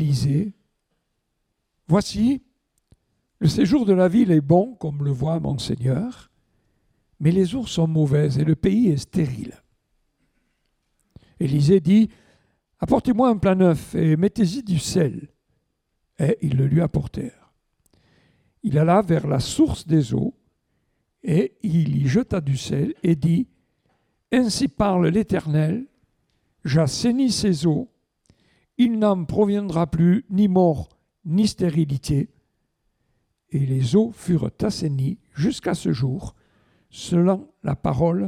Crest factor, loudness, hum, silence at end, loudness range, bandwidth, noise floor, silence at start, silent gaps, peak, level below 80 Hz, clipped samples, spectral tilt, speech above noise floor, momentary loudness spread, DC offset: 16 dB; -21 LUFS; none; 0 s; 4 LU; 13 kHz; -75 dBFS; 0 s; none; -4 dBFS; -48 dBFS; under 0.1%; -7 dB/octave; 55 dB; 10 LU; under 0.1%